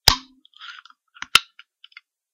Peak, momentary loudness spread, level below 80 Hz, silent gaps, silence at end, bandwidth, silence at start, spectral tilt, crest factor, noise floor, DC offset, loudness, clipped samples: 0 dBFS; 23 LU; -40 dBFS; none; 0.95 s; 15 kHz; 0.05 s; -0.5 dB/octave; 26 dB; -52 dBFS; under 0.1%; -19 LUFS; under 0.1%